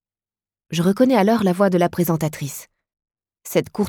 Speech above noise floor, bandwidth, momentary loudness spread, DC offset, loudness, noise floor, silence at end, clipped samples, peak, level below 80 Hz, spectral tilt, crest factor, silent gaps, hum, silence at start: over 72 dB; 19.5 kHz; 14 LU; under 0.1%; -19 LUFS; under -90 dBFS; 0 s; under 0.1%; -4 dBFS; -58 dBFS; -6.5 dB/octave; 16 dB; none; none; 0.7 s